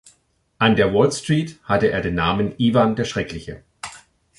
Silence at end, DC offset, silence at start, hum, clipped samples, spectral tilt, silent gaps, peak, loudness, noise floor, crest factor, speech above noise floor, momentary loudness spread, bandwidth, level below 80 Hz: 0.4 s; under 0.1%; 0.6 s; none; under 0.1%; -5.5 dB/octave; none; -2 dBFS; -19 LUFS; -62 dBFS; 18 dB; 43 dB; 19 LU; 11.5 kHz; -44 dBFS